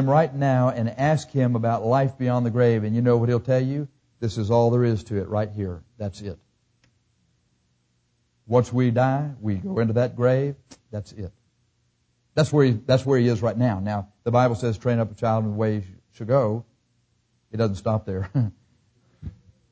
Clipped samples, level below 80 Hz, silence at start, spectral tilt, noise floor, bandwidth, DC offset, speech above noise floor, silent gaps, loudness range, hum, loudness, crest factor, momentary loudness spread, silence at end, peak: under 0.1%; -50 dBFS; 0 s; -8 dB/octave; -69 dBFS; 8 kHz; under 0.1%; 47 dB; none; 6 LU; 60 Hz at -45 dBFS; -23 LUFS; 18 dB; 16 LU; 0.4 s; -6 dBFS